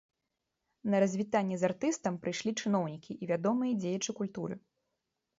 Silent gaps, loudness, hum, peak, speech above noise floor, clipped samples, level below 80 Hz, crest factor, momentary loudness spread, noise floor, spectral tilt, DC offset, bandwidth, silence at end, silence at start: none; -33 LUFS; none; -16 dBFS; 53 dB; under 0.1%; -76 dBFS; 18 dB; 11 LU; -85 dBFS; -5.5 dB/octave; under 0.1%; 8 kHz; 0.8 s; 0.85 s